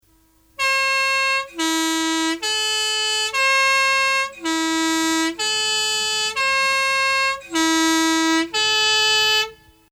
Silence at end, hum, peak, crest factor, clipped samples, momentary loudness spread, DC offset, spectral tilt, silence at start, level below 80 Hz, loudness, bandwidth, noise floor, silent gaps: 0.35 s; none; -8 dBFS; 12 dB; under 0.1%; 6 LU; under 0.1%; 0 dB/octave; 0.6 s; -58 dBFS; -18 LUFS; 17 kHz; -57 dBFS; none